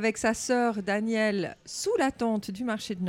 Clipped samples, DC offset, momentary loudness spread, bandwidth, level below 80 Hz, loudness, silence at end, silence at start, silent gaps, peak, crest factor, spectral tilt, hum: under 0.1%; under 0.1%; 6 LU; 16 kHz; -60 dBFS; -28 LUFS; 0 s; 0 s; none; -12 dBFS; 16 dB; -4.5 dB/octave; none